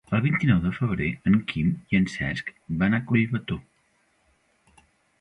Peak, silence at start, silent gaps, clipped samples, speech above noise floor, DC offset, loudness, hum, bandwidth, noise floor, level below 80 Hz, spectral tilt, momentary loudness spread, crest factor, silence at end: -8 dBFS; 0.1 s; none; under 0.1%; 43 dB; under 0.1%; -25 LUFS; none; 10 kHz; -67 dBFS; -46 dBFS; -7.5 dB/octave; 9 LU; 18 dB; 1.6 s